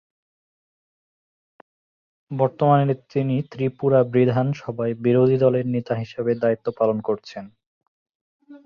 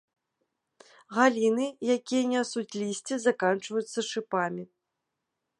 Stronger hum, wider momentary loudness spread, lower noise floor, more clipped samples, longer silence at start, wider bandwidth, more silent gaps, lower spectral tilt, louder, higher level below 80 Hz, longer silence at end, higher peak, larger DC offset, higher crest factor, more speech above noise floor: neither; about the same, 10 LU vs 9 LU; first, under -90 dBFS vs -84 dBFS; neither; first, 2.3 s vs 1.1 s; second, 6.8 kHz vs 11.5 kHz; first, 7.66-7.81 s, 7.88-8.40 s vs none; first, -9.5 dB/octave vs -4 dB/octave; first, -21 LUFS vs -28 LUFS; first, -62 dBFS vs -82 dBFS; second, 0.1 s vs 0.95 s; first, -4 dBFS vs -8 dBFS; neither; about the same, 18 dB vs 22 dB; first, over 69 dB vs 56 dB